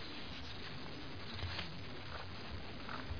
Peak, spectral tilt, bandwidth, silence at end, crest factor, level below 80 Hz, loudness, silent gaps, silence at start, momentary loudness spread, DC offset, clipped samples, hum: -28 dBFS; -3 dB/octave; 5.4 kHz; 0 s; 16 dB; -56 dBFS; -46 LUFS; none; 0 s; 5 LU; 0.4%; under 0.1%; none